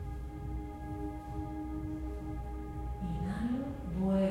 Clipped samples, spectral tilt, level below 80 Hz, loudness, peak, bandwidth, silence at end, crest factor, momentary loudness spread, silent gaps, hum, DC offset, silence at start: under 0.1%; -9 dB/octave; -44 dBFS; -38 LUFS; -20 dBFS; 13.5 kHz; 0 s; 16 dB; 7 LU; none; none; under 0.1%; 0 s